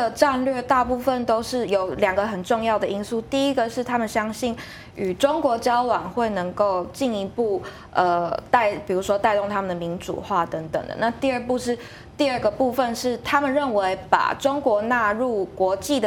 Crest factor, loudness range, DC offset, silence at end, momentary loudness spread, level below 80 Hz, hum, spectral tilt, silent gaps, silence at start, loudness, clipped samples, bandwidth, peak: 20 dB; 2 LU; under 0.1%; 0 s; 7 LU; -50 dBFS; none; -4.5 dB/octave; none; 0 s; -23 LUFS; under 0.1%; 17.5 kHz; -2 dBFS